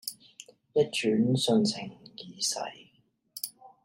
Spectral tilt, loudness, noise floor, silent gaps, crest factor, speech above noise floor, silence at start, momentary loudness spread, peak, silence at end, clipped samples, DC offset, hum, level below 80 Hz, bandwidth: -4.5 dB/octave; -29 LUFS; -68 dBFS; none; 18 dB; 41 dB; 0.05 s; 21 LU; -12 dBFS; 0.15 s; under 0.1%; under 0.1%; none; -74 dBFS; 16 kHz